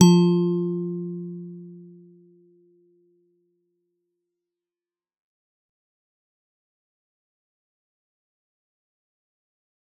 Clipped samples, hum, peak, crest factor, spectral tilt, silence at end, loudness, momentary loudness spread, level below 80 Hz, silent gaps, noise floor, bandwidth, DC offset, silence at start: under 0.1%; none; -2 dBFS; 26 dB; -8 dB/octave; 8.15 s; -23 LUFS; 25 LU; -76 dBFS; none; under -90 dBFS; 8 kHz; under 0.1%; 0 s